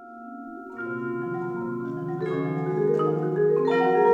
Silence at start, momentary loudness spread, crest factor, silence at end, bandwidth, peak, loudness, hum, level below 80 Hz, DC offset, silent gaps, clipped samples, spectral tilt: 0 s; 17 LU; 16 dB; 0 s; 7.4 kHz; -8 dBFS; -26 LUFS; none; -68 dBFS; under 0.1%; none; under 0.1%; -9 dB/octave